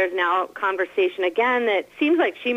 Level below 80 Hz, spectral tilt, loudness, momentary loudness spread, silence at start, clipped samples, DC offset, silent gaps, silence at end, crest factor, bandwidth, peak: -74 dBFS; -4 dB/octave; -22 LUFS; 3 LU; 0 s; under 0.1%; under 0.1%; none; 0 s; 12 dB; 8.6 kHz; -10 dBFS